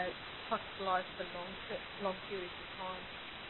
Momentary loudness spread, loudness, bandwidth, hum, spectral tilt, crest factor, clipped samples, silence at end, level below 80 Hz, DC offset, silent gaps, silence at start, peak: 8 LU; -41 LUFS; 4.2 kHz; none; -1.5 dB/octave; 20 dB; under 0.1%; 0 s; -64 dBFS; under 0.1%; none; 0 s; -20 dBFS